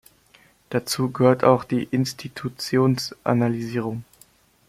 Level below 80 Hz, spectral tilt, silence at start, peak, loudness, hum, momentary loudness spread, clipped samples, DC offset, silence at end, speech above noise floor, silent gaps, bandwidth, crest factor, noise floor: -60 dBFS; -6 dB/octave; 0.7 s; -2 dBFS; -23 LUFS; none; 12 LU; under 0.1%; under 0.1%; 0.65 s; 35 dB; none; 16 kHz; 20 dB; -56 dBFS